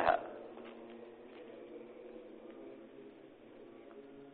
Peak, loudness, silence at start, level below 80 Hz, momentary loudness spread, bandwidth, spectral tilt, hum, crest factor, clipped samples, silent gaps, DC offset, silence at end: -14 dBFS; -47 LUFS; 0 s; -72 dBFS; 8 LU; 4.5 kHz; -2.5 dB/octave; none; 28 dB; under 0.1%; none; under 0.1%; 0 s